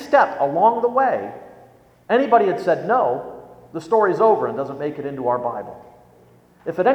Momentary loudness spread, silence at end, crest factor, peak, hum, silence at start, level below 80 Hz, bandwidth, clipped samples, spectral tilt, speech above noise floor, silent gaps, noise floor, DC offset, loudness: 18 LU; 0 s; 18 dB; -2 dBFS; none; 0 s; -64 dBFS; 9 kHz; under 0.1%; -7 dB/octave; 33 dB; none; -52 dBFS; under 0.1%; -19 LUFS